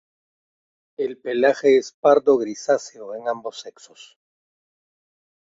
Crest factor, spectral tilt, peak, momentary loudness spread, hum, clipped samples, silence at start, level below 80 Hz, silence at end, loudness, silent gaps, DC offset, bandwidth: 20 dB; -4 dB/octave; -4 dBFS; 18 LU; none; under 0.1%; 1 s; -72 dBFS; 1.8 s; -20 LUFS; 1.94-2.03 s; under 0.1%; 7.8 kHz